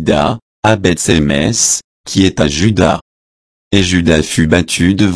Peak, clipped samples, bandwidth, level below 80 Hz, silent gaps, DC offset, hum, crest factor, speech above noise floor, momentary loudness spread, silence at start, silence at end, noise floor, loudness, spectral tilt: 0 dBFS; 0.1%; 11 kHz; -30 dBFS; 0.42-0.63 s, 1.84-2.04 s, 3.01-3.71 s; under 0.1%; none; 12 dB; over 79 dB; 5 LU; 0 s; 0 s; under -90 dBFS; -12 LUFS; -4.5 dB/octave